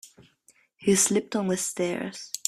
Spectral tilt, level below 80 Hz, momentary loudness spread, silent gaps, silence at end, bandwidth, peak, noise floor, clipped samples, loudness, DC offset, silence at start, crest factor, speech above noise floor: -3.5 dB/octave; -66 dBFS; 10 LU; none; 0.1 s; 15.5 kHz; -6 dBFS; -63 dBFS; under 0.1%; -25 LUFS; under 0.1%; 0.05 s; 22 dB; 37 dB